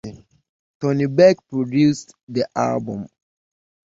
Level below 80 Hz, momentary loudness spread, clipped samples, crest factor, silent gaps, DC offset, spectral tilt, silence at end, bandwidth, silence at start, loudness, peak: -58 dBFS; 17 LU; under 0.1%; 20 dB; 0.49-0.80 s, 2.23-2.27 s; under 0.1%; -7 dB/octave; 0.8 s; 7.8 kHz; 0.05 s; -19 LUFS; -2 dBFS